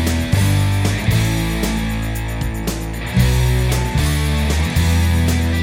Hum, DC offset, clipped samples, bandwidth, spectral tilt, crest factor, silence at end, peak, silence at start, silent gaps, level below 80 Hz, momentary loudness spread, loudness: none; under 0.1%; under 0.1%; 17 kHz; -5.5 dB/octave; 14 dB; 0 s; -2 dBFS; 0 s; none; -22 dBFS; 7 LU; -18 LUFS